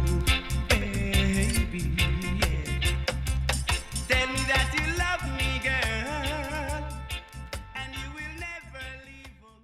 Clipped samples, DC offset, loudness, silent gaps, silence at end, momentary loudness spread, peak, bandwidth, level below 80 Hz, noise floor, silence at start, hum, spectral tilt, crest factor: under 0.1%; under 0.1%; -28 LUFS; none; 0.15 s; 13 LU; -8 dBFS; 15.5 kHz; -32 dBFS; -49 dBFS; 0 s; none; -4 dB/octave; 20 dB